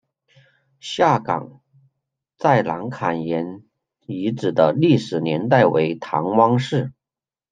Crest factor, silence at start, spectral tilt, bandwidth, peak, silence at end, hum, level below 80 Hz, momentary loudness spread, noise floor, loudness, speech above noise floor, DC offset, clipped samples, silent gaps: 18 dB; 0.85 s; -7 dB/octave; 9.4 kHz; -2 dBFS; 0.6 s; none; -64 dBFS; 10 LU; under -90 dBFS; -20 LUFS; over 71 dB; under 0.1%; under 0.1%; none